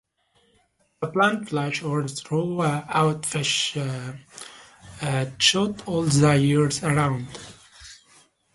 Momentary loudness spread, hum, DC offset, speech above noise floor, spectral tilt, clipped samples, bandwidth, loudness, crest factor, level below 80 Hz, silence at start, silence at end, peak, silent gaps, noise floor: 22 LU; none; under 0.1%; 42 dB; -4.5 dB/octave; under 0.1%; 11.5 kHz; -23 LUFS; 20 dB; -56 dBFS; 1 s; 0.6 s; -6 dBFS; none; -65 dBFS